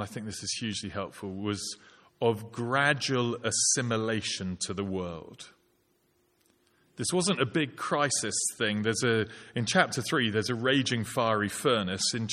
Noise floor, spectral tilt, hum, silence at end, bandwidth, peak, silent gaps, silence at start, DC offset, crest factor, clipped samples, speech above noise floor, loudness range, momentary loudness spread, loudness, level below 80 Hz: -70 dBFS; -3.5 dB/octave; none; 0 s; 15.5 kHz; -8 dBFS; none; 0 s; under 0.1%; 22 dB; under 0.1%; 41 dB; 6 LU; 11 LU; -29 LUFS; -66 dBFS